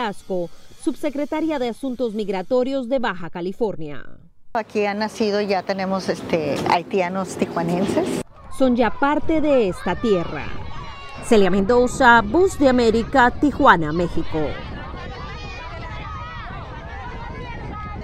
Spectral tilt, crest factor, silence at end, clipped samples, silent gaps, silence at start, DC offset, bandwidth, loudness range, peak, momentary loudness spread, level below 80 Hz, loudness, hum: -5.5 dB/octave; 20 dB; 0 s; under 0.1%; none; 0 s; under 0.1%; 15 kHz; 8 LU; 0 dBFS; 17 LU; -38 dBFS; -20 LUFS; none